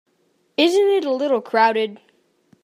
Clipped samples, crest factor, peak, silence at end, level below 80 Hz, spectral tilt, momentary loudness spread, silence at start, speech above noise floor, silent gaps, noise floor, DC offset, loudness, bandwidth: under 0.1%; 18 dB; -2 dBFS; 0.7 s; -80 dBFS; -3.5 dB/octave; 9 LU; 0.6 s; 47 dB; none; -64 dBFS; under 0.1%; -19 LUFS; 15 kHz